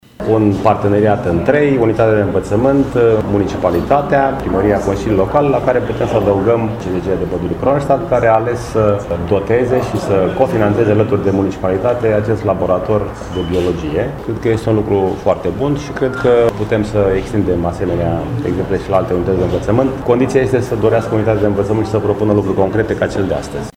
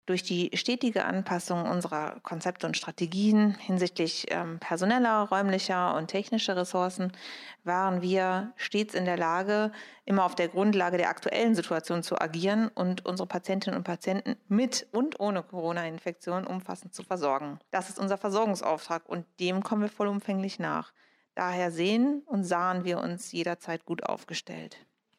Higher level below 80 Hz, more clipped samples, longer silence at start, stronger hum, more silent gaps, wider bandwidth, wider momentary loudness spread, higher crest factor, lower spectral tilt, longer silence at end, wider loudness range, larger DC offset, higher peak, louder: first, -34 dBFS vs -80 dBFS; neither; first, 0.2 s vs 0.05 s; neither; neither; first, 15 kHz vs 13.5 kHz; second, 6 LU vs 9 LU; about the same, 14 dB vs 18 dB; first, -8 dB/octave vs -5 dB/octave; second, 0.05 s vs 0.4 s; about the same, 3 LU vs 4 LU; neither; first, 0 dBFS vs -10 dBFS; first, -15 LUFS vs -30 LUFS